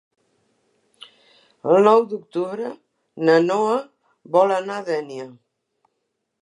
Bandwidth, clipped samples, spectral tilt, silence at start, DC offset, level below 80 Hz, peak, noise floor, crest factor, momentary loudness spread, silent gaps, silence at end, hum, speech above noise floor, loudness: 10.5 kHz; under 0.1%; -6 dB/octave; 1.65 s; under 0.1%; -80 dBFS; -2 dBFS; -76 dBFS; 20 dB; 16 LU; none; 1.1 s; none; 57 dB; -20 LUFS